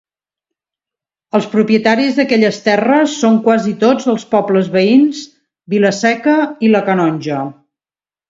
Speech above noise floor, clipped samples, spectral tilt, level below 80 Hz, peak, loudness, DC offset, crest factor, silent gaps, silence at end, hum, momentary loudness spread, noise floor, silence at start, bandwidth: over 78 dB; under 0.1%; -5.5 dB/octave; -60 dBFS; 0 dBFS; -13 LUFS; under 0.1%; 14 dB; none; 0.75 s; none; 7 LU; under -90 dBFS; 1.35 s; 7.8 kHz